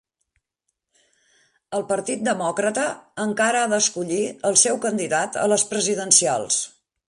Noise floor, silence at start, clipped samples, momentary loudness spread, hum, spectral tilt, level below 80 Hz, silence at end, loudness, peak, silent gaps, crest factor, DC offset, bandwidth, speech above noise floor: -78 dBFS; 1.7 s; under 0.1%; 11 LU; none; -2 dB/octave; -68 dBFS; 0.4 s; -21 LUFS; -2 dBFS; none; 22 dB; under 0.1%; 11.5 kHz; 57 dB